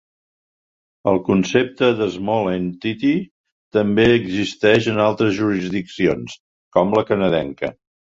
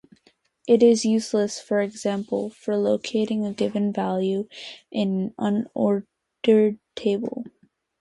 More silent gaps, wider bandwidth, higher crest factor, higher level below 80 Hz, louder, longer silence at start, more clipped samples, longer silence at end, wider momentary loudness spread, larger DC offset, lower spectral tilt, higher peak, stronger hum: first, 3.31-3.44 s, 3.52-3.71 s, 6.40-6.71 s vs none; second, 7.8 kHz vs 11.5 kHz; about the same, 18 dB vs 18 dB; first, -50 dBFS vs -68 dBFS; first, -19 LUFS vs -23 LUFS; first, 1.05 s vs 0.65 s; neither; second, 0.3 s vs 0.5 s; about the same, 9 LU vs 11 LU; neither; about the same, -6.5 dB/octave vs -6 dB/octave; first, -2 dBFS vs -6 dBFS; neither